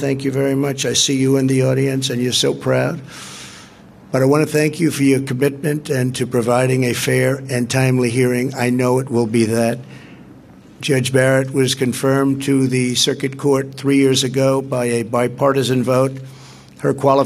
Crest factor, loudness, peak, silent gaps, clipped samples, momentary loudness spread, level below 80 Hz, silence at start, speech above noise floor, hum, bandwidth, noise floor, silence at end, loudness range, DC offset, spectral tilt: 16 dB; -17 LUFS; 0 dBFS; none; under 0.1%; 7 LU; -56 dBFS; 0 s; 25 dB; none; 15 kHz; -42 dBFS; 0 s; 2 LU; under 0.1%; -5 dB/octave